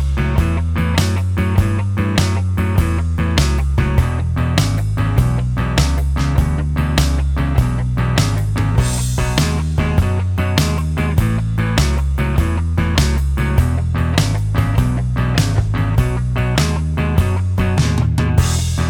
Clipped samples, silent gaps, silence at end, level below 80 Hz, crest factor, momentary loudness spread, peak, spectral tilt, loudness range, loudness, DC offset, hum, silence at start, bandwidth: under 0.1%; none; 0 s; -20 dBFS; 16 dB; 2 LU; 0 dBFS; -5.5 dB/octave; 0 LU; -17 LUFS; under 0.1%; none; 0 s; 18 kHz